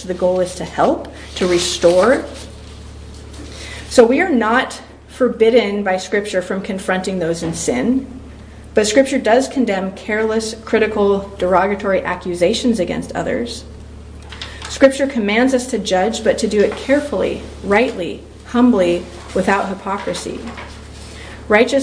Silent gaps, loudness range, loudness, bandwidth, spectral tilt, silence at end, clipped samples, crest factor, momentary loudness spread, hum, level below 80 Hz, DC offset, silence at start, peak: none; 3 LU; -17 LUFS; 10.5 kHz; -4.5 dB/octave; 0 s; under 0.1%; 18 dB; 20 LU; none; -38 dBFS; under 0.1%; 0 s; 0 dBFS